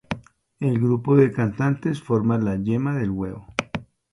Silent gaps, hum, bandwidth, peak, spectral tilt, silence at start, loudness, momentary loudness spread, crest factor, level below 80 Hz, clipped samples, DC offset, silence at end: none; none; 11 kHz; 0 dBFS; -8 dB/octave; 0.1 s; -22 LUFS; 13 LU; 22 dB; -50 dBFS; under 0.1%; under 0.1%; 0.3 s